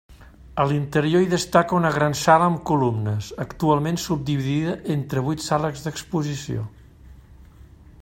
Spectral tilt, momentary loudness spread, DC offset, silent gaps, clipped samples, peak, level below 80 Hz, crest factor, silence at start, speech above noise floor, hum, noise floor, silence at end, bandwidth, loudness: -6 dB/octave; 11 LU; under 0.1%; none; under 0.1%; -2 dBFS; -48 dBFS; 20 dB; 0.1 s; 25 dB; none; -47 dBFS; 0.6 s; 16.5 kHz; -22 LUFS